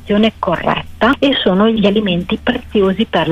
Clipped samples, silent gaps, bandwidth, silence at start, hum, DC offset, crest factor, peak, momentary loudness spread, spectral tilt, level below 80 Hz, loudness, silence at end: under 0.1%; none; 8.2 kHz; 0 s; none; under 0.1%; 12 dB; -2 dBFS; 5 LU; -7 dB/octave; -36 dBFS; -14 LUFS; 0 s